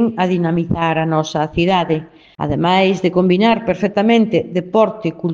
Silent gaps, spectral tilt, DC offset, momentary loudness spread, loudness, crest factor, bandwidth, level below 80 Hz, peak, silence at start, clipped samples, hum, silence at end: none; -7 dB/octave; under 0.1%; 6 LU; -16 LUFS; 16 dB; 7.6 kHz; -44 dBFS; 0 dBFS; 0 s; under 0.1%; none; 0 s